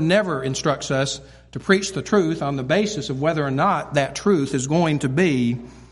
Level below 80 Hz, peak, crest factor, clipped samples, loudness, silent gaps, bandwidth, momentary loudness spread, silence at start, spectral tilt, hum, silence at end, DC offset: -50 dBFS; -2 dBFS; 20 dB; under 0.1%; -21 LUFS; none; 11.5 kHz; 5 LU; 0 s; -5.5 dB/octave; none; 0.05 s; under 0.1%